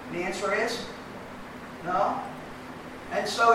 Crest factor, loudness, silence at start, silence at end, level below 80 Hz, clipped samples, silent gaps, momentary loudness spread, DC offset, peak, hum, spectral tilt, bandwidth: 20 dB; -30 LUFS; 0 s; 0 s; -58 dBFS; under 0.1%; none; 14 LU; under 0.1%; -8 dBFS; none; -3.5 dB/octave; 16 kHz